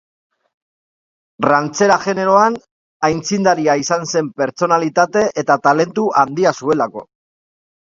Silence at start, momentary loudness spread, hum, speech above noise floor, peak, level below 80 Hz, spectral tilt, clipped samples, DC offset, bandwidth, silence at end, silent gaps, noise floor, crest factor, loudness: 1.4 s; 6 LU; none; over 75 dB; 0 dBFS; -58 dBFS; -4.5 dB/octave; under 0.1%; under 0.1%; 7.8 kHz; 0.9 s; 2.71-3.00 s; under -90 dBFS; 16 dB; -15 LUFS